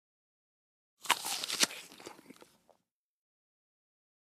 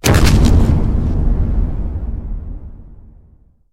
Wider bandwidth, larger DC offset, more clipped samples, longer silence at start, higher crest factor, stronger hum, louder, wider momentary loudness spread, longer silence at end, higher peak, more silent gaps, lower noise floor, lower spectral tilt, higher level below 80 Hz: about the same, 15.5 kHz vs 16.5 kHz; neither; neither; first, 1.05 s vs 0.05 s; first, 36 dB vs 14 dB; neither; second, -32 LUFS vs -16 LUFS; about the same, 21 LU vs 19 LU; first, 1.9 s vs 0.75 s; second, -6 dBFS vs 0 dBFS; neither; first, -80 dBFS vs -48 dBFS; second, 1 dB/octave vs -6 dB/octave; second, -90 dBFS vs -18 dBFS